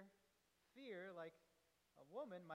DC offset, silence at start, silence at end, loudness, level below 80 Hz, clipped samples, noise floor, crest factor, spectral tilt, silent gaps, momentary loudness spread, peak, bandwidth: under 0.1%; 0 s; 0 s; -56 LUFS; under -90 dBFS; under 0.1%; -82 dBFS; 18 dB; -6 dB/octave; none; 6 LU; -40 dBFS; 13.5 kHz